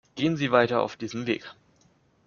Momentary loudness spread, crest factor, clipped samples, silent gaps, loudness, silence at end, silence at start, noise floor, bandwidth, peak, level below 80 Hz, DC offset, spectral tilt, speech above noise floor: 10 LU; 22 dB; under 0.1%; none; -26 LUFS; 0.75 s; 0.15 s; -63 dBFS; 7.2 kHz; -6 dBFS; -66 dBFS; under 0.1%; -4 dB/octave; 38 dB